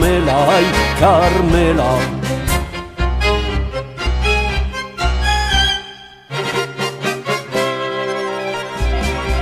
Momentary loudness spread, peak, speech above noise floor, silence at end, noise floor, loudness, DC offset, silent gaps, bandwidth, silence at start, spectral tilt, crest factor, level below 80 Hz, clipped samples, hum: 10 LU; 0 dBFS; 23 dB; 0 s; -36 dBFS; -17 LUFS; under 0.1%; none; 15.5 kHz; 0 s; -5 dB/octave; 16 dB; -22 dBFS; under 0.1%; none